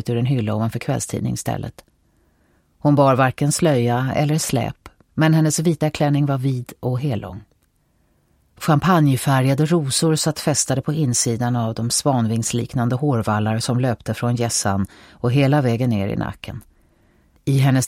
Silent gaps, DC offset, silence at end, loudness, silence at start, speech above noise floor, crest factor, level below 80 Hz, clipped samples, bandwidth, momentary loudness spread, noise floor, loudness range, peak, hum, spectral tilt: none; under 0.1%; 0 s; -19 LUFS; 0.05 s; 44 dB; 18 dB; -50 dBFS; under 0.1%; 16.5 kHz; 10 LU; -62 dBFS; 3 LU; -2 dBFS; none; -5.5 dB/octave